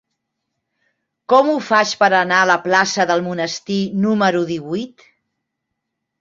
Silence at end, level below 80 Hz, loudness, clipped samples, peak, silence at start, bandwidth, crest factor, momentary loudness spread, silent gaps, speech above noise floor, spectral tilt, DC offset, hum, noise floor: 1.35 s; -62 dBFS; -16 LUFS; under 0.1%; -2 dBFS; 1.3 s; 7.6 kHz; 18 dB; 9 LU; none; 61 dB; -4 dB/octave; under 0.1%; none; -77 dBFS